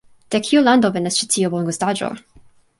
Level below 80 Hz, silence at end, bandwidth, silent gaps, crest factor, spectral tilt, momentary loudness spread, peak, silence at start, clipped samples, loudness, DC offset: -60 dBFS; 0.6 s; 12 kHz; none; 16 dB; -4 dB/octave; 11 LU; -2 dBFS; 0.3 s; under 0.1%; -18 LUFS; under 0.1%